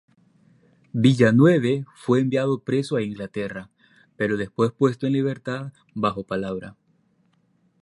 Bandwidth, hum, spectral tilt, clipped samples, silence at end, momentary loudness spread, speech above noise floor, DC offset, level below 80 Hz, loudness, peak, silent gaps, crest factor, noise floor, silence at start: 11.5 kHz; none; -7.5 dB/octave; under 0.1%; 1.15 s; 16 LU; 43 dB; under 0.1%; -60 dBFS; -22 LUFS; -4 dBFS; none; 20 dB; -65 dBFS; 0.95 s